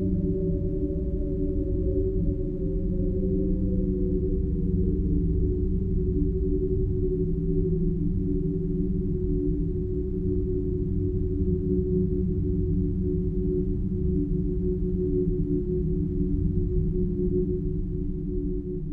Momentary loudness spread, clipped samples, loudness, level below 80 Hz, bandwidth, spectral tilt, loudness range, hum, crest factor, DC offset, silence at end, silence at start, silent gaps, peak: 3 LU; under 0.1%; -27 LUFS; -30 dBFS; 1.6 kHz; -14 dB/octave; 1 LU; none; 14 dB; under 0.1%; 0 s; 0 s; none; -12 dBFS